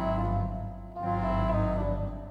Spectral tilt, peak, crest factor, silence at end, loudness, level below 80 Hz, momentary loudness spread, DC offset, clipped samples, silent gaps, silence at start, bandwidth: -9.5 dB/octave; -16 dBFS; 14 dB; 0 s; -31 LUFS; -36 dBFS; 9 LU; under 0.1%; under 0.1%; none; 0 s; 5.2 kHz